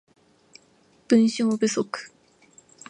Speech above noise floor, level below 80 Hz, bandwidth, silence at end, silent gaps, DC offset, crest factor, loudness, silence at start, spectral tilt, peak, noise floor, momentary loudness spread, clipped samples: 38 dB; -72 dBFS; 9.8 kHz; 0.8 s; none; under 0.1%; 20 dB; -23 LUFS; 1.1 s; -4.5 dB/octave; -6 dBFS; -60 dBFS; 15 LU; under 0.1%